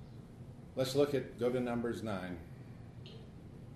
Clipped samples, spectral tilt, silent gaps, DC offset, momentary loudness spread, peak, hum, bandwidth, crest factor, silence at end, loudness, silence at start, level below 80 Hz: under 0.1%; -6 dB/octave; none; under 0.1%; 19 LU; -20 dBFS; none; 13 kHz; 20 dB; 0 s; -36 LUFS; 0 s; -62 dBFS